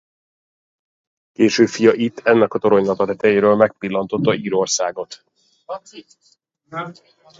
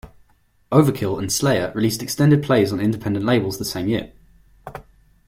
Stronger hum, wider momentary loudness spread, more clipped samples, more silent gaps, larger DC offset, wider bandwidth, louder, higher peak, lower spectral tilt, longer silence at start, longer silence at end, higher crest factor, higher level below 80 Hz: neither; second, 18 LU vs 22 LU; neither; neither; neither; second, 7.8 kHz vs 16.5 kHz; first, -17 LUFS vs -20 LUFS; about the same, 0 dBFS vs -2 dBFS; about the same, -4.5 dB/octave vs -5.5 dB/octave; first, 1.4 s vs 0.05 s; about the same, 0.5 s vs 0.45 s; about the same, 18 dB vs 18 dB; second, -60 dBFS vs -48 dBFS